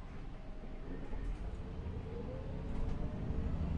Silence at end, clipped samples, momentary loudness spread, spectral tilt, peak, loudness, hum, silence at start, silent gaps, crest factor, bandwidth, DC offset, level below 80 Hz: 0 s; under 0.1%; 10 LU; -8.5 dB/octave; -26 dBFS; -44 LUFS; none; 0 s; none; 14 dB; 7.2 kHz; under 0.1%; -42 dBFS